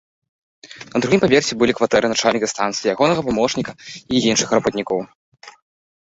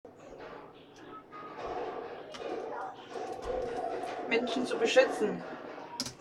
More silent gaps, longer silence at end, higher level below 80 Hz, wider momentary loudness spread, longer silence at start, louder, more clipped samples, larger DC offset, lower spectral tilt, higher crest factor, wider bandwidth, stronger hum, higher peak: first, 5.15-5.32 s vs none; first, 0.6 s vs 0 s; first, -52 dBFS vs -62 dBFS; second, 10 LU vs 22 LU; first, 0.65 s vs 0.05 s; first, -18 LUFS vs -34 LUFS; neither; neither; about the same, -4 dB/octave vs -3.5 dB/octave; second, 18 dB vs 26 dB; second, 8.2 kHz vs 13.5 kHz; neither; first, -2 dBFS vs -10 dBFS